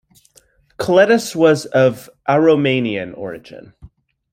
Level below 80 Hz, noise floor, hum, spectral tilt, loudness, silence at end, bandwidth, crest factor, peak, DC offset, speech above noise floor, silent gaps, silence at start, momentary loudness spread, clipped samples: -54 dBFS; -54 dBFS; none; -5.5 dB/octave; -15 LUFS; 0.45 s; 15.5 kHz; 16 dB; -2 dBFS; under 0.1%; 38 dB; none; 0.8 s; 16 LU; under 0.1%